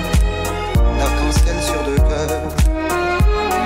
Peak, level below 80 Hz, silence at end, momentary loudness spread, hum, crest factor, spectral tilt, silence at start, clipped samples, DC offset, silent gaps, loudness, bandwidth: -4 dBFS; -18 dBFS; 0 s; 3 LU; none; 10 dB; -5.5 dB/octave; 0 s; under 0.1%; under 0.1%; none; -18 LUFS; 16.5 kHz